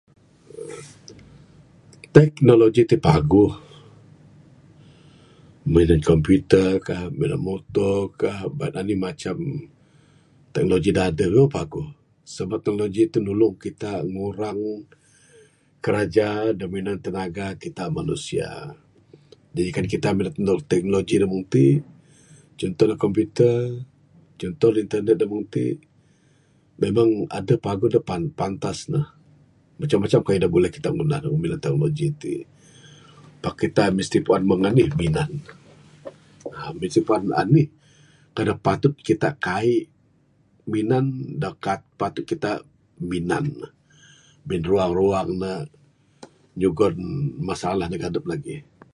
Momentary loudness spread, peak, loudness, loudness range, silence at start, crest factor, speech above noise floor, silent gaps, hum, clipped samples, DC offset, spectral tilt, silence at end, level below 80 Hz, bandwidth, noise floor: 16 LU; 0 dBFS; -22 LUFS; 6 LU; 0.55 s; 22 dB; 39 dB; none; none; under 0.1%; under 0.1%; -7.5 dB/octave; 0.35 s; -44 dBFS; 11.5 kHz; -60 dBFS